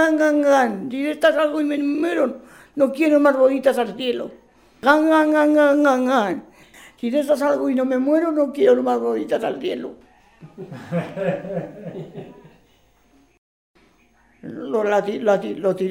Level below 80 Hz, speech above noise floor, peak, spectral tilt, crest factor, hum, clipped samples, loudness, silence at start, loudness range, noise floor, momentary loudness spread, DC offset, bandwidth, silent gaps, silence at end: -64 dBFS; 39 dB; 0 dBFS; -6 dB/octave; 20 dB; none; under 0.1%; -19 LUFS; 0 s; 13 LU; -58 dBFS; 19 LU; under 0.1%; 15.5 kHz; 13.38-13.74 s; 0 s